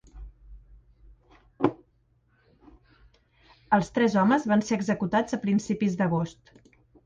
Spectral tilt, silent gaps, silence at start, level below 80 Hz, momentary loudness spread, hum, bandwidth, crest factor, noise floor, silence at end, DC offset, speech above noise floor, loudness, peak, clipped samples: -6.5 dB/octave; none; 0.15 s; -54 dBFS; 7 LU; none; 7.8 kHz; 22 dB; -66 dBFS; 0.75 s; under 0.1%; 42 dB; -26 LUFS; -8 dBFS; under 0.1%